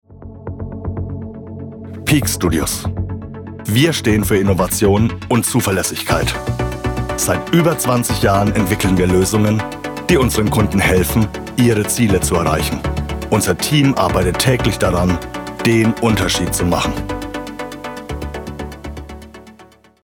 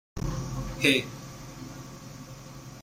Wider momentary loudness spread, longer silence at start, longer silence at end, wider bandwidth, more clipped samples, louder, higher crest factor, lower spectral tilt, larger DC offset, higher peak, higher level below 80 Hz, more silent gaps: second, 15 LU vs 21 LU; about the same, 0.1 s vs 0.15 s; first, 0.4 s vs 0 s; first, 19.5 kHz vs 16 kHz; neither; first, -16 LUFS vs -28 LUFS; second, 14 dB vs 26 dB; about the same, -5 dB/octave vs -4 dB/octave; neither; first, -2 dBFS vs -6 dBFS; first, -32 dBFS vs -44 dBFS; neither